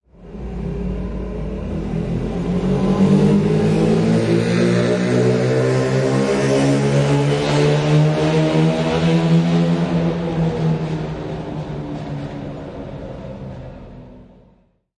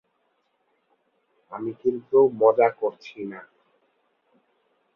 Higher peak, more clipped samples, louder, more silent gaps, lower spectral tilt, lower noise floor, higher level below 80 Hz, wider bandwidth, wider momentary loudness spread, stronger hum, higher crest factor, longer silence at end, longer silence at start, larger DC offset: about the same, -4 dBFS vs -6 dBFS; neither; first, -18 LUFS vs -22 LUFS; neither; about the same, -7 dB/octave vs -8 dB/octave; second, -55 dBFS vs -71 dBFS; first, -36 dBFS vs -74 dBFS; first, 11 kHz vs 6 kHz; about the same, 16 LU vs 18 LU; neither; second, 14 dB vs 22 dB; second, 0.75 s vs 1.55 s; second, 0.2 s vs 1.5 s; neither